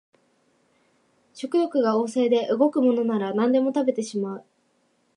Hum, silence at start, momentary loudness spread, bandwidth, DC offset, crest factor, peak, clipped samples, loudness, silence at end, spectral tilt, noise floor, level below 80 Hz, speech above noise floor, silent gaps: none; 1.35 s; 10 LU; 11 kHz; under 0.1%; 16 dB; -8 dBFS; under 0.1%; -23 LUFS; 0.75 s; -6 dB/octave; -67 dBFS; -80 dBFS; 45 dB; none